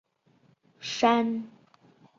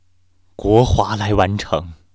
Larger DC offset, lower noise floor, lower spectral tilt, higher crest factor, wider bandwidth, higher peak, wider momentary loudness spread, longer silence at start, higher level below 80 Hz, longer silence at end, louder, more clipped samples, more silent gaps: second, under 0.1% vs 0.2%; first, -65 dBFS vs -61 dBFS; second, -4 dB/octave vs -6.5 dB/octave; about the same, 22 dB vs 18 dB; about the same, 7.6 kHz vs 8 kHz; second, -8 dBFS vs 0 dBFS; first, 17 LU vs 10 LU; first, 0.8 s vs 0.6 s; second, -76 dBFS vs -30 dBFS; first, 0.7 s vs 0.2 s; second, -26 LUFS vs -17 LUFS; neither; neither